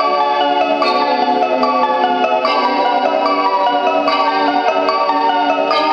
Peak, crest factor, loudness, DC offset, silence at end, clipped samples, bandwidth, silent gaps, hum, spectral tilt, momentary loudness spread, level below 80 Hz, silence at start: 0 dBFS; 14 dB; -14 LUFS; under 0.1%; 0 s; under 0.1%; 7.6 kHz; none; none; -4 dB/octave; 1 LU; -62 dBFS; 0 s